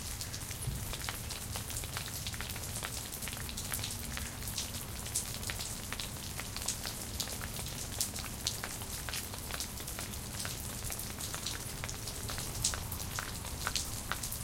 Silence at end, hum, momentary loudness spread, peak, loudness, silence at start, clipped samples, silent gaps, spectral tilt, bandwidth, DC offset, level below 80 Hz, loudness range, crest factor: 0 s; none; 4 LU; -8 dBFS; -38 LUFS; 0 s; under 0.1%; none; -2 dB/octave; 17 kHz; under 0.1%; -48 dBFS; 1 LU; 32 dB